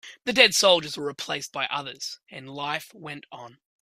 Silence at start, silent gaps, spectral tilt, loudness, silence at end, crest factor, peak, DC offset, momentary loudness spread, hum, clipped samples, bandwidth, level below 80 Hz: 0.05 s; none; -1.5 dB/octave; -23 LUFS; 0.35 s; 24 dB; -2 dBFS; under 0.1%; 22 LU; none; under 0.1%; 15.5 kHz; -70 dBFS